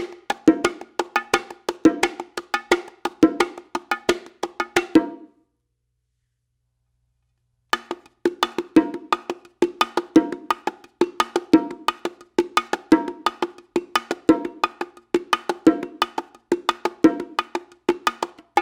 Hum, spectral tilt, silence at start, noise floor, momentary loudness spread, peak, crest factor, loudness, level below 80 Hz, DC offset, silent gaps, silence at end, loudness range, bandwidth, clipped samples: none; -4 dB/octave; 0 s; -74 dBFS; 10 LU; 0 dBFS; 22 dB; -23 LUFS; -58 dBFS; under 0.1%; none; 0 s; 5 LU; 19 kHz; under 0.1%